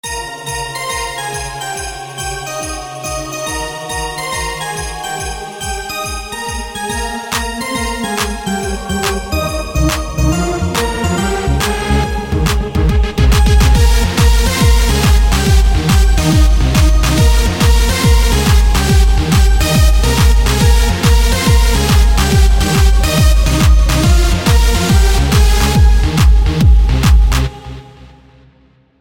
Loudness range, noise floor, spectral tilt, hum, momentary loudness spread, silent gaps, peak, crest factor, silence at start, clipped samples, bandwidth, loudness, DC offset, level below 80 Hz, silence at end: 9 LU; -49 dBFS; -4.5 dB/octave; none; 10 LU; none; 0 dBFS; 12 dB; 0.05 s; under 0.1%; 17 kHz; -13 LUFS; under 0.1%; -14 dBFS; 1.2 s